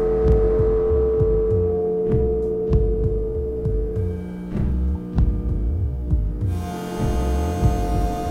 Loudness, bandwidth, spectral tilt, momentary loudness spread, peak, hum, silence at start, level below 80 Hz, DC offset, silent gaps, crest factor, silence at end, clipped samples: -22 LUFS; 14.5 kHz; -8.5 dB/octave; 7 LU; -6 dBFS; none; 0 s; -24 dBFS; under 0.1%; none; 14 dB; 0 s; under 0.1%